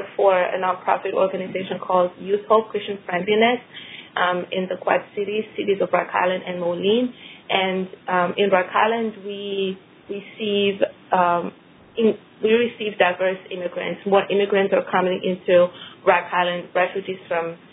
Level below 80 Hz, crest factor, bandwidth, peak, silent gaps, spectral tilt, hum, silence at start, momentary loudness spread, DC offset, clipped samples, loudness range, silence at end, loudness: -68 dBFS; 22 dB; 4 kHz; 0 dBFS; none; -9 dB/octave; none; 0 s; 10 LU; under 0.1%; under 0.1%; 3 LU; 0.15 s; -21 LUFS